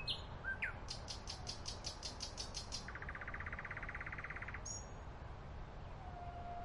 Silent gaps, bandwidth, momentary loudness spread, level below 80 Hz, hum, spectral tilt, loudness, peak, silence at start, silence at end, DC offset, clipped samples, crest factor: none; 11.5 kHz; 9 LU; -54 dBFS; none; -2.5 dB/octave; -47 LUFS; -28 dBFS; 0 s; 0 s; under 0.1%; under 0.1%; 18 dB